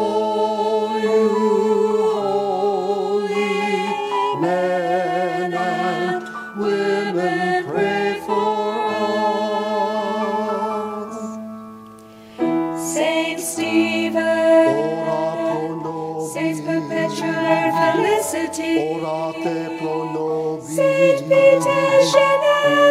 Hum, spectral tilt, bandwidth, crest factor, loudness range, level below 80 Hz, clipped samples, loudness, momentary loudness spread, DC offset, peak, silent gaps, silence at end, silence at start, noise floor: none; -4.5 dB/octave; 15.5 kHz; 18 dB; 4 LU; -68 dBFS; under 0.1%; -19 LUFS; 9 LU; under 0.1%; -2 dBFS; none; 0 s; 0 s; -41 dBFS